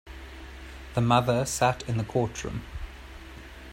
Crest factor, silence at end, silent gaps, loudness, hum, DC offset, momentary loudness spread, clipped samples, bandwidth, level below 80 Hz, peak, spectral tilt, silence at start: 22 dB; 0 s; none; -27 LUFS; none; under 0.1%; 21 LU; under 0.1%; 16 kHz; -44 dBFS; -8 dBFS; -5 dB/octave; 0.05 s